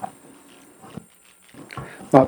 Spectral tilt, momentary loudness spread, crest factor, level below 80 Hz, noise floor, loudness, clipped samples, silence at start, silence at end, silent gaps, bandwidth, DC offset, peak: -7.5 dB/octave; 14 LU; 24 dB; -60 dBFS; -53 dBFS; -26 LUFS; under 0.1%; 0 s; 0 s; none; 19 kHz; under 0.1%; 0 dBFS